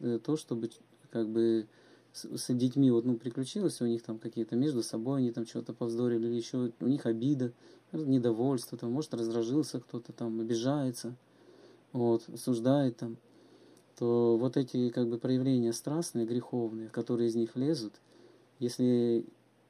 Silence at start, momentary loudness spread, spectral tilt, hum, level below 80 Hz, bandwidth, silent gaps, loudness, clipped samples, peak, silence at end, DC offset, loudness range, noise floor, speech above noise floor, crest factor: 0 s; 11 LU; -7 dB/octave; none; -82 dBFS; 14.5 kHz; none; -32 LUFS; under 0.1%; -16 dBFS; 0.45 s; under 0.1%; 3 LU; -60 dBFS; 29 dB; 16 dB